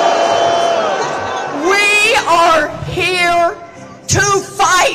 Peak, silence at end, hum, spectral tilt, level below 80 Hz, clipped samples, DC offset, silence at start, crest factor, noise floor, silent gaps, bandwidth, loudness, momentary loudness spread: 0 dBFS; 0 s; none; -2.5 dB/octave; -42 dBFS; under 0.1%; under 0.1%; 0 s; 12 dB; -33 dBFS; none; 16 kHz; -12 LUFS; 9 LU